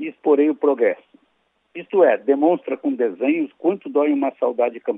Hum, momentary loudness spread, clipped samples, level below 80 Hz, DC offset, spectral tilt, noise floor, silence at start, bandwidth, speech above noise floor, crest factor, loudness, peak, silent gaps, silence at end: none; 7 LU; under 0.1%; -86 dBFS; under 0.1%; -9 dB/octave; -67 dBFS; 0 s; 3.8 kHz; 48 dB; 16 dB; -20 LUFS; -4 dBFS; none; 0 s